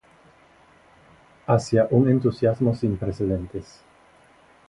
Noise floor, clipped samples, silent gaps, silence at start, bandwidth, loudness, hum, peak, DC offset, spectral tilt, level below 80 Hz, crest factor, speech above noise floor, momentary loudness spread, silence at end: -55 dBFS; under 0.1%; none; 1.5 s; 11 kHz; -22 LUFS; none; -4 dBFS; under 0.1%; -8.5 dB/octave; -48 dBFS; 20 dB; 33 dB; 14 LU; 1.05 s